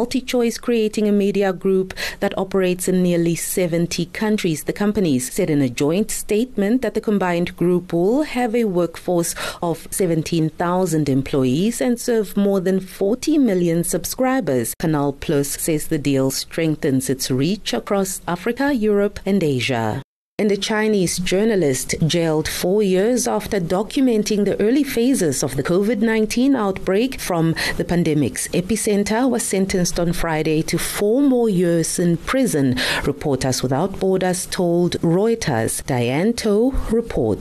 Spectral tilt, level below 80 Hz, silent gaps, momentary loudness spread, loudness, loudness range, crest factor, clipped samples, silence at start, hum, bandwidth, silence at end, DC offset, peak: -5 dB/octave; -38 dBFS; 20.04-20.38 s; 4 LU; -19 LUFS; 2 LU; 10 dB; under 0.1%; 0 s; none; 13.5 kHz; 0 s; under 0.1%; -10 dBFS